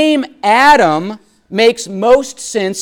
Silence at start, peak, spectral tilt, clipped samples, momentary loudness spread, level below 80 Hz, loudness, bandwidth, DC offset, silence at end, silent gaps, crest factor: 0 s; 0 dBFS; -3.5 dB/octave; under 0.1%; 12 LU; -46 dBFS; -12 LUFS; 17.5 kHz; under 0.1%; 0 s; none; 12 dB